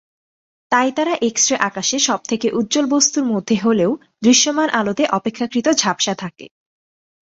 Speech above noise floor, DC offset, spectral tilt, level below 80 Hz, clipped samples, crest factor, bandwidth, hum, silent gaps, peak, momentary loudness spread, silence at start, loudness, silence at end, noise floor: over 73 dB; under 0.1%; -2.5 dB/octave; -60 dBFS; under 0.1%; 18 dB; 8 kHz; none; none; 0 dBFS; 6 LU; 0.7 s; -17 LUFS; 0.9 s; under -90 dBFS